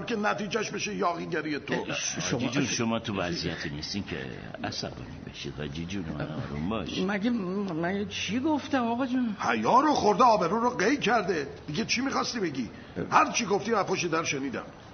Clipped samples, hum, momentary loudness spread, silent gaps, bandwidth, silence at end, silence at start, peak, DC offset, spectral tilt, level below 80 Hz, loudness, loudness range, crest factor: under 0.1%; none; 13 LU; none; 6.6 kHz; 0 s; 0 s; -6 dBFS; under 0.1%; -4 dB/octave; -54 dBFS; -28 LUFS; 9 LU; 22 dB